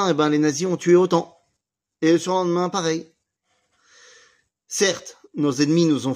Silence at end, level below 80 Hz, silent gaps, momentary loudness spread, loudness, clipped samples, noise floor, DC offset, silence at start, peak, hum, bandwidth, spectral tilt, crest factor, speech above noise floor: 0 s; -70 dBFS; none; 12 LU; -20 LUFS; under 0.1%; -79 dBFS; under 0.1%; 0 s; -4 dBFS; none; 15.5 kHz; -5 dB/octave; 16 dB; 60 dB